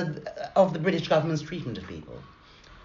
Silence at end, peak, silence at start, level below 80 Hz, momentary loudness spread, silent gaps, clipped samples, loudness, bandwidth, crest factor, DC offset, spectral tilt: 0 s; -8 dBFS; 0 s; -56 dBFS; 18 LU; none; under 0.1%; -27 LUFS; 7.4 kHz; 20 dB; under 0.1%; -5.5 dB/octave